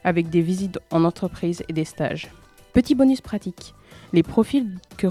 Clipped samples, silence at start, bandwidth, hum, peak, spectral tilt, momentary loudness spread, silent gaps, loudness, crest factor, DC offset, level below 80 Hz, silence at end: under 0.1%; 0.05 s; 14.5 kHz; none; -4 dBFS; -7 dB/octave; 13 LU; none; -22 LUFS; 18 dB; under 0.1%; -48 dBFS; 0 s